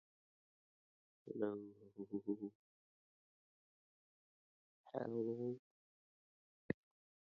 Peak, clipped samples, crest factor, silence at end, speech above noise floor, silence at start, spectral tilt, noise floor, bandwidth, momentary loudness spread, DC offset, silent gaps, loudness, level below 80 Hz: -24 dBFS; under 0.1%; 26 dB; 0.5 s; over 46 dB; 1.25 s; -8.5 dB/octave; under -90 dBFS; 5.6 kHz; 11 LU; under 0.1%; 2.55-4.84 s, 5.59-6.69 s; -47 LUFS; -84 dBFS